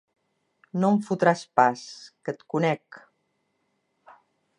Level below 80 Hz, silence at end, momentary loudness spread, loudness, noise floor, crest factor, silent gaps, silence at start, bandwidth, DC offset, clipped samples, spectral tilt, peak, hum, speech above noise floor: -80 dBFS; 1.8 s; 15 LU; -25 LUFS; -74 dBFS; 22 dB; none; 0.75 s; 10.5 kHz; under 0.1%; under 0.1%; -6.5 dB/octave; -4 dBFS; none; 50 dB